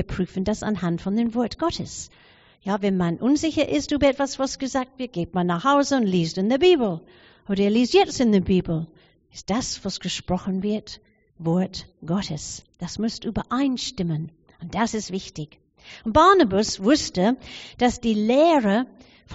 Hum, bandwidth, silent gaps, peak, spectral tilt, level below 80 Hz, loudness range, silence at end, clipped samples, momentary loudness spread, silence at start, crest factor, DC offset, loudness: none; 8 kHz; none; -4 dBFS; -5 dB/octave; -46 dBFS; 7 LU; 0 s; under 0.1%; 16 LU; 0 s; 20 dB; under 0.1%; -22 LUFS